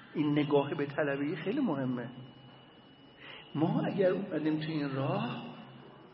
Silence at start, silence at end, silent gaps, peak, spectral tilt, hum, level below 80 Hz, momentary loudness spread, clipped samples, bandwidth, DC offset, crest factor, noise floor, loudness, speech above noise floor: 0 s; 0.05 s; none; -14 dBFS; -10.5 dB/octave; none; -74 dBFS; 20 LU; under 0.1%; 5.8 kHz; under 0.1%; 18 dB; -57 dBFS; -32 LUFS; 25 dB